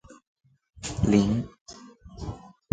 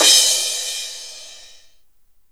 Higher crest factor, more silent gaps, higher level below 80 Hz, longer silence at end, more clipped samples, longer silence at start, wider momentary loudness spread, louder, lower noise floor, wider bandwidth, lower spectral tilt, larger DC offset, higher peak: about the same, 22 dB vs 20 dB; first, 0.27-0.36 s, 1.61-1.66 s vs none; first, -46 dBFS vs -62 dBFS; second, 0.25 s vs 0.95 s; neither; about the same, 0.1 s vs 0 s; about the same, 24 LU vs 25 LU; second, -26 LUFS vs -16 LUFS; second, -47 dBFS vs -58 dBFS; second, 9.4 kHz vs over 20 kHz; first, -6.5 dB/octave vs 3.5 dB/octave; second, under 0.1% vs 0.4%; second, -6 dBFS vs 0 dBFS